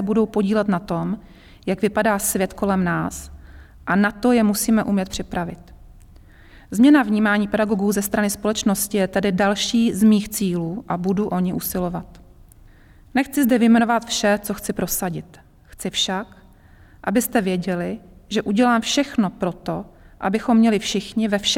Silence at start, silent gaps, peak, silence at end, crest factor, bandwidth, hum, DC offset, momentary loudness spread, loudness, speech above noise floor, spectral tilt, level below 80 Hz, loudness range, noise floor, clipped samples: 0 s; none; -6 dBFS; 0 s; 14 dB; 17 kHz; none; under 0.1%; 12 LU; -20 LUFS; 28 dB; -4.5 dB/octave; -46 dBFS; 5 LU; -48 dBFS; under 0.1%